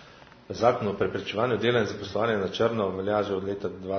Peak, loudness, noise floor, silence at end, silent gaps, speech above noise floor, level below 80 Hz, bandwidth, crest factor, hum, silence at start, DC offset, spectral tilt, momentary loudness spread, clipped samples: -6 dBFS; -27 LUFS; -50 dBFS; 0 s; none; 24 dB; -60 dBFS; 6.6 kHz; 20 dB; none; 0 s; under 0.1%; -6 dB/octave; 6 LU; under 0.1%